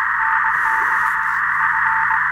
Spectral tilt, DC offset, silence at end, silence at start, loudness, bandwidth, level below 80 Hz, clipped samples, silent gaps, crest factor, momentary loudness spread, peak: -2.5 dB/octave; under 0.1%; 0 s; 0 s; -16 LUFS; 17 kHz; -52 dBFS; under 0.1%; none; 12 dB; 2 LU; -6 dBFS